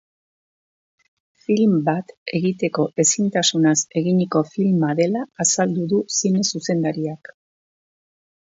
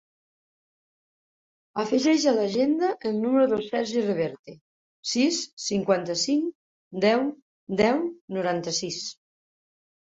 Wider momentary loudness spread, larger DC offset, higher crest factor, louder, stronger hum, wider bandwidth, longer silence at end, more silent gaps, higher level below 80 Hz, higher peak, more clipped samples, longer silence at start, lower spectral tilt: second, 7 LU vs 10 LU; neither; about the same, 18 dB vs 18 dB; first, -20 LUFS vs -25 LUFS; neither; about the same, 8 kHz vs 8 kHz; first, 1.4 s vs 1.05 s; second, 2.17-2.26 s vs 4.39-4.44 s, 4.61-5.03 s, 5.53-5.57 s, 6.55-6.91 s, 7.42-7.67 s, 8.21-8.28 s; about the same, -68 dBFS vs -66 dBFS; first, -2 dBFS vs -8 dBFS; neither; second, 1.5 s vs 1.75 s; about the same, -4.5 dB/octave vs -4 dB/octave